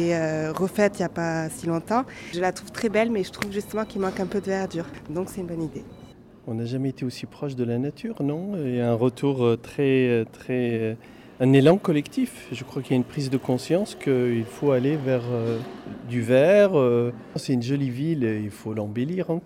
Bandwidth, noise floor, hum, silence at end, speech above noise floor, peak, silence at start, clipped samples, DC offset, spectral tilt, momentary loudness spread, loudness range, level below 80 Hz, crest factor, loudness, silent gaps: 16 kHz; -47 dBFS; none; 0 s; 23 dB; -6 dBFS; 0 s; under 0.1%; under 0.1%; -7 dB/octave; 12 LU; 8 LU; -58 dBFS; 18 dB; -25 LUFS; none